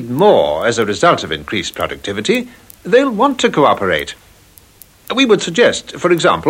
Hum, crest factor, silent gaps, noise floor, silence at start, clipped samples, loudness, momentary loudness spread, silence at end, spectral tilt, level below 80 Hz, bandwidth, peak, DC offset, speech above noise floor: none; 14 dB; none; -45 dBFS; 0 s; under 0.1%; -14 LUFS; 9 LU; 0 s; -4.5 dB/octave; -48 dBFS; 16.5 kHz; 0 dBFS; under 0.1%; 31 dB